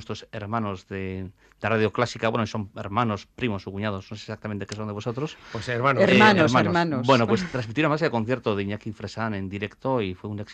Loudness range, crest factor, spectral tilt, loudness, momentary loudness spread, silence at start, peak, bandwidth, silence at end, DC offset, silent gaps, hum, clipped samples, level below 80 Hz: 8 LU; 20 dB; -6 dB/octave; -24 LUFS; 14 LU; 0 s; -4 dBFS; 9.2 kHz; 0 s; under 0.1%; none; none; under 0.1%; -58 dBFS